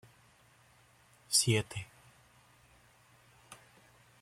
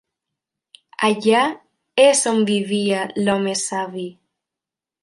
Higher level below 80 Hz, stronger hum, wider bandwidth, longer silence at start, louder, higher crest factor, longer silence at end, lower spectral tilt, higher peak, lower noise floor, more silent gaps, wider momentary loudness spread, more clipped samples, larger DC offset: about the same, -70 dBFS vs -66 dBFS; neither; first, 15.5 kHz vs 11.5 kHz; first, 1.3 s vs 1 s; second, -31 LUFS vs -19 LUFS; first, 28 dB vs 20 dB; second, 0.7 s vs 0.9 s; about the same, -3 dB/octave vs -3.5 dB/octave; second, -12 dBFS vs -2 dBFS; second, -64 dBFS vs -88 dBFS; neither; first, 28 LU vs 16 LU; neither; neither